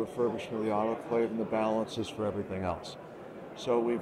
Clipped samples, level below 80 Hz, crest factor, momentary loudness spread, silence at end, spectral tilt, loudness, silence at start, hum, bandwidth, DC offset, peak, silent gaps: under 0.1%; -64 dBFS; 16 dB; 14 LU; 0 s; -6.5 dB/octave; -32 LUFS; 0 s; none; 13.5 kHz; under 0.1%; -16 dBFS; none